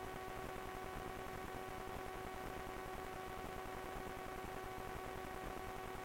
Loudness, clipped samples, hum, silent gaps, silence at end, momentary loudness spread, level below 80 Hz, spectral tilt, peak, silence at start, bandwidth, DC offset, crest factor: -48 LUFS; under 0.1%; none; none; 0 s; 0 LU; -56 dBFS; -4.5 dB/octave; -34 dBFS; 0 s; 16.5 kHz; under 0.1%; 14 dB